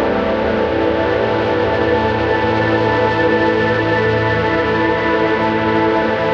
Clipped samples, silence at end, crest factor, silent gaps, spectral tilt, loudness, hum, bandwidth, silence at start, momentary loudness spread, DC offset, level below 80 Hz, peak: under 0.1%; 0 s; 12 dB; none; -7.5 dB/octave; -15 LUFS; none; 7.4 kHz; 0 s; 2 LU; under 0.1%; -36 dBFS; -2 dBFS